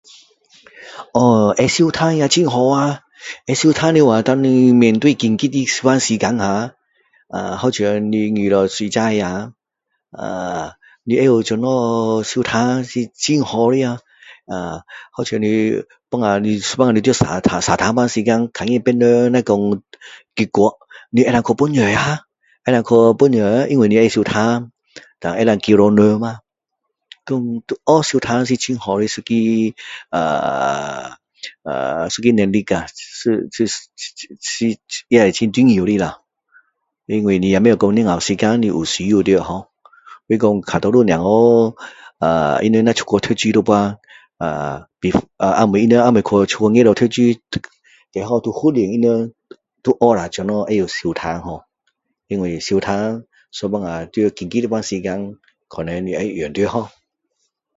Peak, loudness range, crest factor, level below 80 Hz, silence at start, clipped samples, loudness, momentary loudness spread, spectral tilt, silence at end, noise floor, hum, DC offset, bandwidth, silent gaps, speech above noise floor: 0 dBFS; 6 LU; 16 dB; -48 dBFS; 0.8 s; under 0.1%; -16 LUFS; 14 LU; -5.5 dB/octave; 0.9 s; -77 dBFS; none; under 0.1%; 8 kHz; none; 61 dB